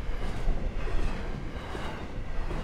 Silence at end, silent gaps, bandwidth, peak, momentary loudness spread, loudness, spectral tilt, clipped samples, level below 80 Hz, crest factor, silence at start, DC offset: 0 s; none; 9.2 kHz; -16 dBFS; 4 LU; -37 LUFS; -6.5 dB/octave; under 0.1%; -32 dBFS; 14 dB; 0 s; under 0.1%